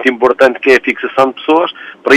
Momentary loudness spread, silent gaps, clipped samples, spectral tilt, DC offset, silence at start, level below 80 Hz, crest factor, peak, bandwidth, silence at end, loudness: 7 LU; none; 0.2%; -4 dB/octave; under 0.1%; 0 s; -54 dBFS; 10 dB; 0 dBFS; 12.5 kHz; 0 s; -11 LUFS